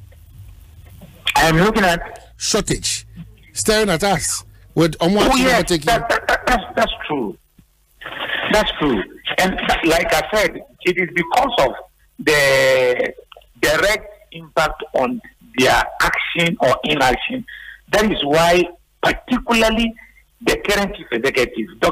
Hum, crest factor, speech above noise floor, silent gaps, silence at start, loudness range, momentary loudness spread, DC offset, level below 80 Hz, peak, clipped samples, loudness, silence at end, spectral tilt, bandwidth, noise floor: none; 16 dB; 36 dB; none; 0 s; 3 LU; 10 LU; under 0.1%; -36 dBFS; -4 dBFS; under 0.1%; -17 LUFS; 0 s; -3.5 dB/octave; 16 kHz; -54 dBFS